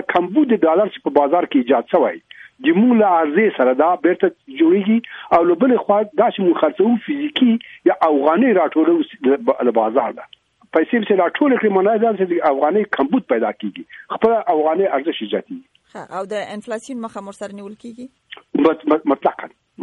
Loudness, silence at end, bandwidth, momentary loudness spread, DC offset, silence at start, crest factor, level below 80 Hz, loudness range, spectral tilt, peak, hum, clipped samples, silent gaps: -17 LUFS; 0 s; 9.8 kHz; 15 LU; under 0.1%; 0 s; 16 dB; -64 dBFS; 7 LU; -7 dB/octave; -2 dBFS; none; under 0.1%; none